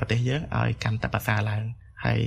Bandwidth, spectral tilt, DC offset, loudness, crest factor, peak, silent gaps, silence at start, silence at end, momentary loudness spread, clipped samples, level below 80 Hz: 14 kHz; -6.5 dB/octave; under 0.1%; -27 LUFS; 18 dB; -8 dBFS; none; 0 s; 0 s; 6 LU; under 0.1%; -44 dBFS